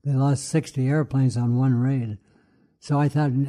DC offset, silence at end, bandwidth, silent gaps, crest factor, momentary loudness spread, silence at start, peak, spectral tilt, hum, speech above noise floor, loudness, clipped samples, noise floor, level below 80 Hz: under 0.1%; 0 s; 11 kHz; none; 12 dB; 6 LU; 0.05 s; -10 dBFS; -7.5 dB/octave; none; 39 dB; -23 LUFS; under 0.1%; -60 dBFS; -58 dBFS